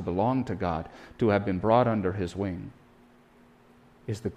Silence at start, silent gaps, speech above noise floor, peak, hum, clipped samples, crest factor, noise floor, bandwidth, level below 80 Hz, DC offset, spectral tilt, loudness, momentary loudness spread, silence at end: 0 s; none; 30 dB; -8 dBFS; none; under 0.1%; 20 dB; -57 dBFS; 11.5 kHz; -54 dBFS; under 0.1%; -8 dB/octave; -28 LUFS; 17 LU; 0 s